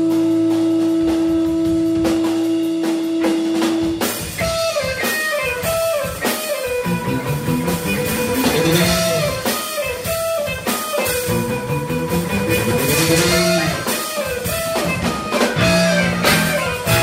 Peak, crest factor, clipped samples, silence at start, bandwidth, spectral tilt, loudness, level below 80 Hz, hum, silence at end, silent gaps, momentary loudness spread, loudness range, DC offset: 0 dBFS; 18 dB; under 0.1%; 0 s; 16.5 kHz; -4.5 dB/octave; -18 LUFS; -40 dBFS; none; 0 s; none; 6 LU; 3 LU; under 0.1%